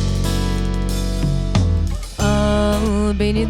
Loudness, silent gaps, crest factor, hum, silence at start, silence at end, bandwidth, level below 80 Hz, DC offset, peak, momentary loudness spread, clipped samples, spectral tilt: -19 LUFS; none; 14 dB; none; 0 s; 0 s; 15.5 kHz; -22 dBFS; under 0.1%; -4 dBFS; 5 LU; under 0.1%; -6 dB/octave